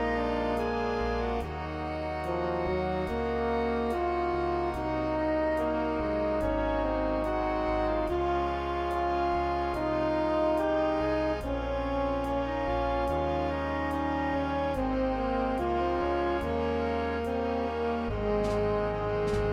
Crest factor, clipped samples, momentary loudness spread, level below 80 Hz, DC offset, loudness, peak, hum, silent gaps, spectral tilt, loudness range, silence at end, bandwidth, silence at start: 12 dB; under 0.1%; 3 LU; -40 dBFS; under 0.1%; -30 LUFS; -16 dBFS; none; none; -7.5 dB/octave; 2 LU; 0 s; 15 kHz; 0 s